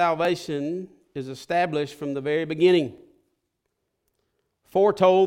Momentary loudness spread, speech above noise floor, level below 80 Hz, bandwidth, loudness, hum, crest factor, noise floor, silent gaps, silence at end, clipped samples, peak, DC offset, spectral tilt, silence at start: 15 LU; 55 dB; -68 dBFS; 12.5 kHz; -24 LUFS; none; 18 dB; -78 dBFS; none; 0 s; under 0.1%; -6 dBFS; under 0.1%; -6 dB/octave; 0 s